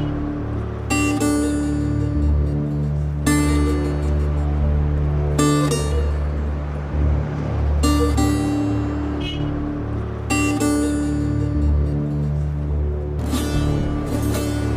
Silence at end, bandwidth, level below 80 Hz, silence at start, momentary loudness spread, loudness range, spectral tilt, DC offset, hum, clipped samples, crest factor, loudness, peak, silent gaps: 0 s; 15.5 kHz; -24 dBFS; 0 s; 7 LU; 2 LU; -6.5 dB/octave; under 0.1%; none; under 0.1%; 16 dB; -21 LUFS; -4 dBFS; none